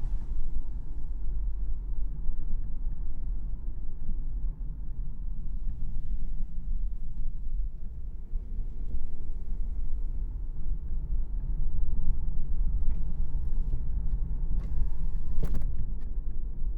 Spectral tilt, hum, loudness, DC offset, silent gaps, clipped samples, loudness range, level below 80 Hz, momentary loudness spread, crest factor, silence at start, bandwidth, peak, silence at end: -10 dB/octave; none; -38 LUFS; under 0.1%; none; under 0.1%; 5 LU; -28 dBFS; 6 LU; 12 dB; 0 s; 1 kHz; -12 dBFS; 0 s